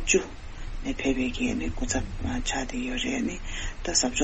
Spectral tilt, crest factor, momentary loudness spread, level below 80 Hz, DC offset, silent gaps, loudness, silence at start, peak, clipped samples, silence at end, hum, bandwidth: -3 dB/octave; 20 dB; 11 LU; -36 dBFS; under 0.1%; none; -29 LUFS; 0 s; -8 dBFS; under 0.1%; 0 s; none; 8.4 kHz